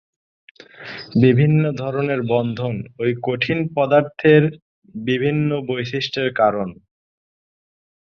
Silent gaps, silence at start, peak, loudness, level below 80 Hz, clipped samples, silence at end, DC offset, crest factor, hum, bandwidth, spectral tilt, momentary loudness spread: 4.62-4.82 s; 0.8 s; -2 dBFS; -19 LUFS; -56 dBFS; under 0.1%; 1.35 s; under 0.1%; 18 dB; none; 6.6 kHz; -8 dB/octave; 13 LU